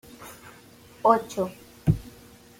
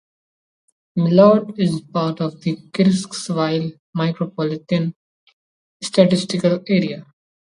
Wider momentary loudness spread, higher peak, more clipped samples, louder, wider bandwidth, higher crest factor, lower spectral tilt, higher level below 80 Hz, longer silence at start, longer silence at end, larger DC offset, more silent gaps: first, 23 LU vs 13 LU; second, -6 dBFS vs 0 dBFS; neither; second, -26 LUFS vs -19 LUFS; first, 16.5 kHz vs 11 kHz; about the same, 22 dB vs 20 dB; about the same, -7 dB/octave vs -6.5 dB/octave; first, -48 dBFS vs -62 dBFS; second, 0.2 s vs 0.95 s; about the same, 0.5 s vs 0.45 s; neither; second, none vs 3.79-3.93 s, 4.96-5.27 s, 5.33-5.80 s